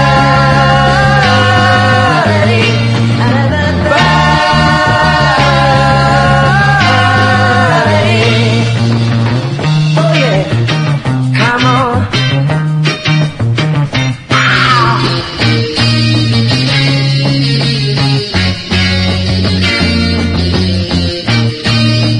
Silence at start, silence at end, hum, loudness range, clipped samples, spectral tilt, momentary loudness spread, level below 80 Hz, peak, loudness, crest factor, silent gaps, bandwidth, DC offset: 0 s; 0 s; none; 3 LU; 0.2%; -5.5 dB/octave; 5 LU; -30 dBFS; 0 dBFS; -9 LUFS; 10 dB; none; 10.5 kHz; under 0.1%